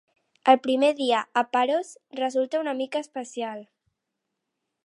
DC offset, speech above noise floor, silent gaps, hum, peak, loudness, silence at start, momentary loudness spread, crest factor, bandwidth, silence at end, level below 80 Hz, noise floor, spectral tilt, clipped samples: under 0.1%; 58 dB; none; none; -4 dBFS; -25 LUFS; 0.45 s; 14 LU; 22 dB; 11.5 kHz; 1.2 s; -80 dBFS; -82 dBFS; -3 dB/octave; under 0.1%